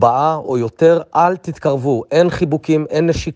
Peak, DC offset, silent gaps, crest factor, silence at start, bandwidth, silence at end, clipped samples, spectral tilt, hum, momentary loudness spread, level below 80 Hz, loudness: 0 dBFS; under 0.1%; none; 14 dB; 0 s; 8.2 kHz; 0 s; under 0.1%; -7 dB/octave; none; 6 LU; -42 dBFS; -16 LUFS